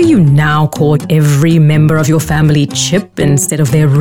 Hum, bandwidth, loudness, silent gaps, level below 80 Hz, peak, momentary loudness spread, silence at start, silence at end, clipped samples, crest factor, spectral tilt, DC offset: none; 16 kHz; -10 LUFS; none; -34 dBFS; -2 dBFS; 4 LU; 0 s; 0 s; under 0.1%; 8 dB; -6 dB/octave; under 0.1%